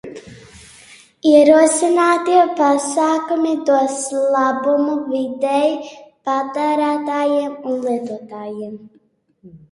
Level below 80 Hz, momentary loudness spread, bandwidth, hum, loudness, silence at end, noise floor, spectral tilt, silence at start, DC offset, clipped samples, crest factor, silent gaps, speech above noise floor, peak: -62 dBFS; 17 LU; 11.5 kHz; none; -16 LUFS; 0.15 s; -45 dBFS; -3.5 dB/octave; 0.05 s; under 0.1%; under 0.1%; 18 dB; none; 29 dB; 0 dBFS